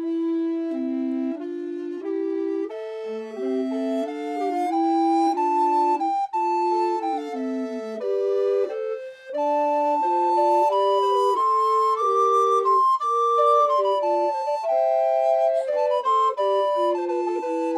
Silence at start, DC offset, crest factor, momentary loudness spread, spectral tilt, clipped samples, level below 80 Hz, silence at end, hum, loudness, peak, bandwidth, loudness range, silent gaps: 0 s; under 0.1%; 14 dB; 10 LU; -4 dB/octave; under 0.1%; -86 dBFS; 0 s; none; -22 LUFS; -8 dBFS; 12.5 kHz; 8 LU; none